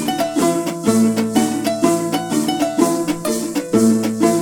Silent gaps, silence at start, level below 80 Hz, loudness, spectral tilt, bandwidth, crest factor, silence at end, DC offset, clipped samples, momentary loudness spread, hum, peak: none; 0 s; -54 dBFS; -17 LUFS; -4.5 dB/octave; 17.5 kHz; 16 dB; 0 s; under 0.1%; under 0.1%; 5 LU; none; 0 dBFS